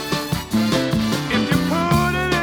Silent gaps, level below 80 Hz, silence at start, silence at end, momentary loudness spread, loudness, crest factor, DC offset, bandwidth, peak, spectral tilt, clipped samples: none; -36 dBFS; 0 s; 0 s; 4 LU; -19 LUFS; 16 dB; under 0.1%; over 20 kHz; -4 dBFS; -5 dB/octave; under 0.1%